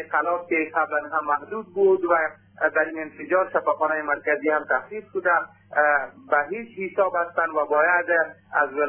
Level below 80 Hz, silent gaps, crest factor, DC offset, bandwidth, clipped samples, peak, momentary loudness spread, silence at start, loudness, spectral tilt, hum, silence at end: -72 dBFS; none; 18 dB; under 0.1%; 3.4 kHz; under 0.1%; -6 dBFS; 7 LU; 0 s; -23 LUFS; -8.5 dB/octave; none; 0 s